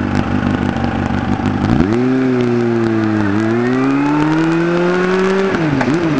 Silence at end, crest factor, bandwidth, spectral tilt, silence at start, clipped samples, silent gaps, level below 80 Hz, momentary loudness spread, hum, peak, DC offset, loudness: 0 s; 14 dB; 8 kHz; -7.5 dB/octave; 0 s; under 0.1%; none; -34 dBFS; 3 LU; none; 0 dBFS; 1%; -15 LUFS